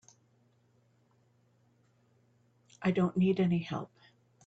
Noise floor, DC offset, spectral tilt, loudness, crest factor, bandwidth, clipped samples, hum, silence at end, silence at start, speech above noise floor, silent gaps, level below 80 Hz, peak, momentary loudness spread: -69 dBFS; under 0.1%; -8 dB/octave; -31 LUFS; 18 dB; 7.8 kHz; under 0.1%; none; 0.6 s; 2.8 s; 40 dB; none; -72 dBFS; -18 dBFS; 12 LU